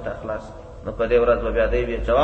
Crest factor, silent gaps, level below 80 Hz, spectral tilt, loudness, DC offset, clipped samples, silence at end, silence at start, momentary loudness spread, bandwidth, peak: 14 dB; none; -32 dBFS; -7.5 dB/octave; -21 LUFS; under 0.1%; under 0.1%; 0 s; 0 s; 16 LU; 8 kHz; -6 dBFS